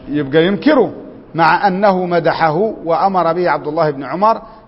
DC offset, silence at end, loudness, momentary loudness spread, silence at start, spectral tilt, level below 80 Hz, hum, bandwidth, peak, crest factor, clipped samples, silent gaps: under 0.1%; 0.1 s; -14 LUFS; 5 LU; 0 s; -9 dB/octave; -48 dBFS; none; 5.8 kHz; 0 dBFS; 14 dB; under 0.1%; none